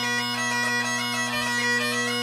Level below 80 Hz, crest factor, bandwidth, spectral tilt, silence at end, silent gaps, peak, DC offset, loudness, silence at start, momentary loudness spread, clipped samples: -66 dBFS; 12 dB; 16 kHz; -2 dB/octave; 0 s; none; -14 dBFS; under 0.1%; -23 LUFS; 0 s; 2 LU; under 0.1%